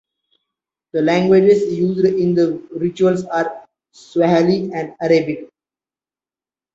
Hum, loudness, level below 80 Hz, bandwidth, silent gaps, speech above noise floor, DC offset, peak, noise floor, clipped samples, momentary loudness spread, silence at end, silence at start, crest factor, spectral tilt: none; -17 LUFS; -60 dBFS; 7.8 kHz; none; over 74 dB; under 0.1%; -2 dBFS; under -90 dBFS; under 0.1%; 12 LU; 1.3 s; 0.95 s; 16 dB; -7.5 dB/octave